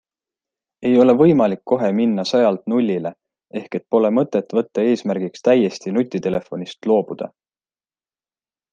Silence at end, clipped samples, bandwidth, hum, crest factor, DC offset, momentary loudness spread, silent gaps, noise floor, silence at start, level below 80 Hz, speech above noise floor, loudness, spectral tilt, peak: 1.45 s; under 0.1%; 7.6 kHz; none; 16 dB; under 0.1%; 14 LU; none; under -90 dBFS; 0.8 s; -62 dBFS; over 72 dB; -18 LUFS; -7 dB/octave; -2 dBFS